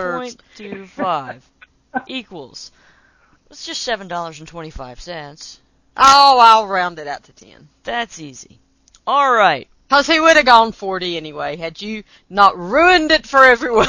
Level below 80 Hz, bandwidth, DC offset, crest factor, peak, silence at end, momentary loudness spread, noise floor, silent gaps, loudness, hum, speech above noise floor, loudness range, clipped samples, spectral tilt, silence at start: -46 dBFS; 8 kHz; under 0.1%; 16 dB; 0 dBFS; 0 s; 24 LU; -55 dBFS; none; -13 LUFS; none; 39 dB; 14 LU; 0.2%; -2.5 dB/octave; 0 s